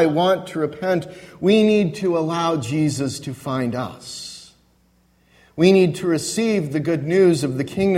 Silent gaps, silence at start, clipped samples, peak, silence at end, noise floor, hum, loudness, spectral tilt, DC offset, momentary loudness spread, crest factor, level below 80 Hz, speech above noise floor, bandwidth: none; 0 s; under 0.1%; -2 dBFS; 0 s; -59 dBFS; none; -20 LUFS; -6 dB/octave; under 0.1%; 15 LU; 18 dB; -56 dBFS; 40 dB; 15 kHz